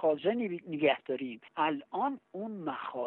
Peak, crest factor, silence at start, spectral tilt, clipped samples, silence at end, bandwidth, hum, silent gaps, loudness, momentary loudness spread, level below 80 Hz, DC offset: -14 dBFS; 18 dB; 0 s; -8.5 dB/octave; under 0.1%; 0 s; 4.2 kHz; none; none; -33 LUFS; 10 LU; -80 dBFS; under 0.1%